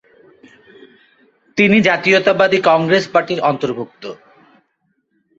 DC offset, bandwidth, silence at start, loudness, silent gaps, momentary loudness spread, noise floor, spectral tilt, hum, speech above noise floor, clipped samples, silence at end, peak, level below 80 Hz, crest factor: under 0.1%; 7.8 kHz; 1.55 s; -14 LUFS; none; 15 LU; -66 dBFS; -5.5 dB/octave; none; 52 dB; under 0.1%; 1.25 s; 0 dBFS; -58 dBFS; 18 dB